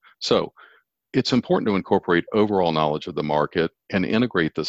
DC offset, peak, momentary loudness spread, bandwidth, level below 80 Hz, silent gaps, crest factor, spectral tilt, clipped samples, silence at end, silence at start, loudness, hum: under 0.1%; -4 dBFS; 5 LU; 8 kHz; -54 dBFS; none; 18 dB; -6 dB/octave; under 0.1%; 0 s; 0.2 s; -22 LUFS; none